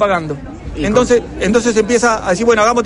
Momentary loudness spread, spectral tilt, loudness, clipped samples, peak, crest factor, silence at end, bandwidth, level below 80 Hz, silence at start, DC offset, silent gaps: 12 LU; -4.5 dB/octave; -14 LUFS; under 0.1%; -2 dBFS; 12 dB; 0 s; 10.5 kHz; -34 dBFS; 0 s; under 0.1%; none